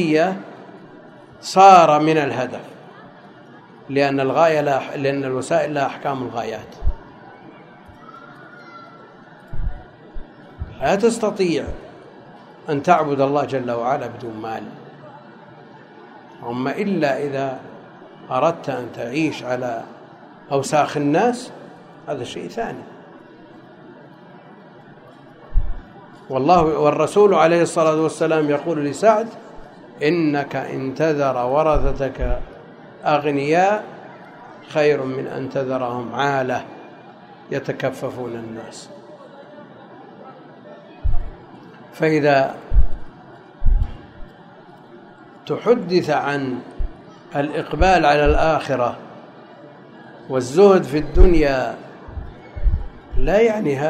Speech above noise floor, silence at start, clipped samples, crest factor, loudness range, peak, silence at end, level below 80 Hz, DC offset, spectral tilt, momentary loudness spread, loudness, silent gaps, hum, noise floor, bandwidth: 26 dB; 0 s; under 0.1%; 20 dB; 15 LU; 0 dBFS; 0 s; -28 dBFS; under 0.1%; -6 dB/octave; 25 LU; -19 LUFS; none; none; -44 dBFS; 11.5 kHz